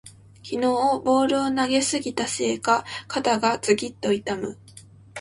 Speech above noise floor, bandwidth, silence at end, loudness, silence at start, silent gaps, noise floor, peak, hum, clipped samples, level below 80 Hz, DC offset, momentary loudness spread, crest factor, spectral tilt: 25 dB; 11.5 kHz; 0 s; -23 LUFS; 0.05 s; none; -48 dBFS; -6 dBFS; none; under 0.1%; -60 dBFS; under 0.1%; 11 LU; 18 dB; -3.5 dB/octave